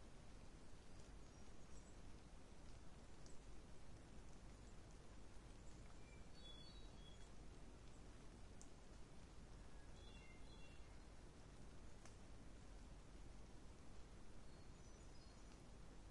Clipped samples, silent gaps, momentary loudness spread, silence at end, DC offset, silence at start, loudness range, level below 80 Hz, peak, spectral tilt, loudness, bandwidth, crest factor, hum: under 0.1%; none; 2 LU; 0 s; under 0.1%; 0 s; 1 LU; -64 dBFS; -40 dBFS; -4.5 dB/octave; -64 LUFS; 11 kHz; 18 dB; none